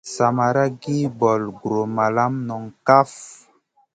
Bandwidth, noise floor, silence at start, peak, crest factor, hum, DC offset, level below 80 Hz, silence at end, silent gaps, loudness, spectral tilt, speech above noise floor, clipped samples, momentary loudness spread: 9.4 kHz; -60 dBFS; 0.05 s; 0 dBFS; 20 dB; none; under 0.1%; -62 dBFS; 0.6 s; none; -20 LUFS; -6.5 dB/octave; 40 dB; under 0.1%; 11 LU